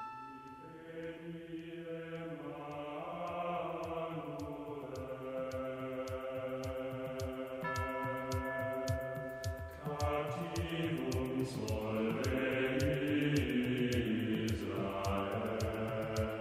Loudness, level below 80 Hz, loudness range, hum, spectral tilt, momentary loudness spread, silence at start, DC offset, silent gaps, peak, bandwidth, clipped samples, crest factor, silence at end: -38 LUFS; -54 dBFS; 8 LU; none; -6 dB/octave; 11 LU; 0 s; under 0.1%; none; -22 dBFS; 16 kHz; under 0.1%; 16 dB; 0 s